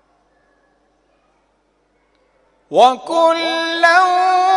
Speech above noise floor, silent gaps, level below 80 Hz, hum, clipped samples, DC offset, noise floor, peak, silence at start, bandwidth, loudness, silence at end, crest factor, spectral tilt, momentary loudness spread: 48 dB; none; -66 dBFS; 50 Hz at -70 dBFS; under 0.1%; under 0.1%; -61 dBFS; 0 dBFS; 2.7 s; 11 kHz; -14 LUFS; 0 s; 18 dB; -2 dB/octave; 6 LU